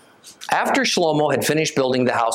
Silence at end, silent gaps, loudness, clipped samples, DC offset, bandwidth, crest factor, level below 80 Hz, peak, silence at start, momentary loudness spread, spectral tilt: 0 s; none; -19 LUFS; under 0.1%; under 0.1%; 17 kHz; 16 dB; -66 dBFS; -4 dBFS; 0.25 s; 4 LU; -4 dB/octave